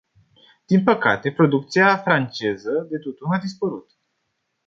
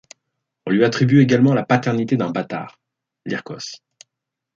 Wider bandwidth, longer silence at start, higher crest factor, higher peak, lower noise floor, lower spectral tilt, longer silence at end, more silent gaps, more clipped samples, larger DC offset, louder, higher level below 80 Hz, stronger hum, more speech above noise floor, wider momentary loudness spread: about the same, 7.6 kHz vs 7.6 kHz; about the same, 0.7 s vs 0.65 s; about the same, 20 dB vs 18 dB; about the same, -2 dBFS vs -2 dBFS; second, -74 dBFS vs -82 dBFS; about the same, -7 dB/octave vs -7 dB/octave; about the same, 0.85 s vs 0.8 s; neither; neither; neither; about the same, -20 LUFS vs -18 LUFS; about the same, -64 dBFS vs -60 dBFS; neither; second, 54 dB vs 65 dB; second, 11 LU vs 20 LU